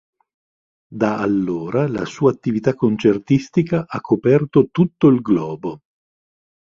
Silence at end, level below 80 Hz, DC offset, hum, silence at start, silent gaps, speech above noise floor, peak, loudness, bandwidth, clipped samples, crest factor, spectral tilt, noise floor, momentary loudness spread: 0.9 s; -54 dBFS; under 0.1%; none; 0.9 s; none; over 73 dB; -2 dBFS; -18 LUFS; 7.4 kHz; under 0.1%; 16 dB; -8.5 dB/octave; under -90 dBFS; 8 LU